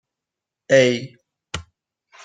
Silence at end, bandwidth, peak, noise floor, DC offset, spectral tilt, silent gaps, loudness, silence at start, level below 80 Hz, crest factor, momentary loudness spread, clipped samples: 0.65 s; 9.4 kHz; -2 dBFS; -86 dBFS; under 0.1%; -4.5 dB/octave; none; -18 LUFS; 0.7 s; -56 dBFS; 20 dB; 18 LU; under 0.1%